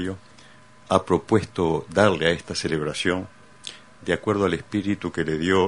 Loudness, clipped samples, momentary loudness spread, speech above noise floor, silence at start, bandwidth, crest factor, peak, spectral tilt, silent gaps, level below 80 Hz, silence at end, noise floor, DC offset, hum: -23 LUFS; under 0.1%; 18 LU; 28 dB; 0 s; 10.5 kHz; 22 dB; -2 dBFS; -5.5 dB/octave; none; -50 dBFS; 0 s; -50 dBFS; 0.2%; none